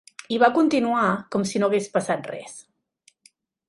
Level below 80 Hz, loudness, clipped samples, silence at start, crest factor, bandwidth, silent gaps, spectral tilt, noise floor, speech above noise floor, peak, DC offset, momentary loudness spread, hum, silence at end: -68 dBFS; -22 LUFS; under 0.1%; 0.3 s; 20 dB; 11.5 kHz; none; -5 dB/octave; -63 dBFS; 41 dB; -4 dBFS; under 0.1%; 17 LU; none; 1.05 s